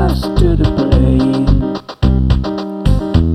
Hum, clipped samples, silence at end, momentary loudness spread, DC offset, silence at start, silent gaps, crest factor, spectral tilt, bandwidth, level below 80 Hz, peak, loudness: none; under 0.1%; 0 s; 5 LU; under 0.1%; 0 s; none; 12 dB; -8.5 dB/octave; 13 kHz; -16 dBFS; 0 dBFS; -14 LUFS